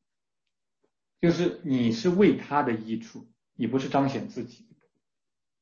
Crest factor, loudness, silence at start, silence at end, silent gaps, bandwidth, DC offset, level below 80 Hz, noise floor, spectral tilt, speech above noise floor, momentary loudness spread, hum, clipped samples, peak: 18 dB; -26 LUFS; 1.25 s; 1.1 s; none; 7.2 kHz; under 0.1%; -62 dBFS; under -90 dBFS; -7 dB/octave; over 64 dB; 15 LU; none; under 0.1%; -10 dBFS